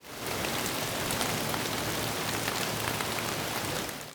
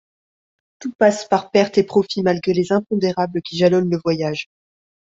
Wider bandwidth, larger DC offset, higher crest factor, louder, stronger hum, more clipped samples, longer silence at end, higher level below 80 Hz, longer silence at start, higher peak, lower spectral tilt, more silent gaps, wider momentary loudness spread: first, over 20 kHz vs 7.8 kHz; neither; about the same, 22 dB vs 18 dB; second, -31 LUFS vs -19 LUFS; neither; neither; second, 0 s vs 0.7 s; first, -54 dBFS vs -60 dBFS; second, 0 s vs 0.8 s; second, -12 dBFS vs -2 dBFS; second, -2.5 dB/octave vs -6 dB/octave; second, none vs 0.95-0.99 s; second, 3 LU vs 9 LU